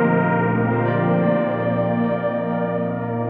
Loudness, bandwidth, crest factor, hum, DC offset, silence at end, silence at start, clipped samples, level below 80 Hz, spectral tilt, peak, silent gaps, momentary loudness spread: -20 LUFS; 4.1 kHz; 14 dB; none; under 0.1%; 0 s; 0 s; under 0.1%; -56 dBFS; -11.5 dB/octave; -6 dBFS; none; 4 LU